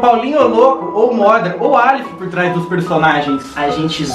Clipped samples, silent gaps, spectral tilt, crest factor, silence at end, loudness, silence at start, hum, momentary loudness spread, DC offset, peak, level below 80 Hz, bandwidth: 0.1%; none; -6 dB/octave; 12 dB; 0 s; -13 LUFS; 0 s; none; 7 LU; under 0.1%; 0 dBFS; -48 dBFS; 12.5 kHz